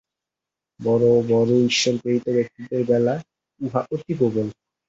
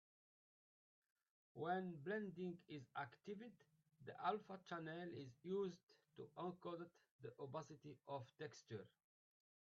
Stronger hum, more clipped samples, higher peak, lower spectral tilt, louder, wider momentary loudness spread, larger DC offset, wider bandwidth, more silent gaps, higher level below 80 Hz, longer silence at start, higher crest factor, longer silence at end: neither; neither; first, -6 dBFS vs -30 dBFS; about the same, -5.5 dB/octave vs -5 dB/octave; first, -21 LUFS vs -52 LUFS; second, 11 LU vs 15 LU; neither; first, 8 kHz vs 7.2 kHz; second, none vs 5.83-5.87 s, 7.11-7.19 s; first, -62 dBFS vs under -90 dBFS; second, 0.8 s vs 1.55 s; second, 16 dB vs 22 dB; second, 0.35 s vs 0.75 s